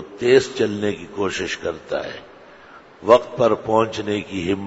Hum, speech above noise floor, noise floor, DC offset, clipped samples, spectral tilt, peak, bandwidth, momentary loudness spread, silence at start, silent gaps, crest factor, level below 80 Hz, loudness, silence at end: none; 25 dB; -45 dBFS; under 0.1%; under 0.1%; -5 dB/octave; 0 dBFS; 8 kHz; 11 LU; 0 s; none; 20 dB; -56 dBFS; -20 LUFS; 0 s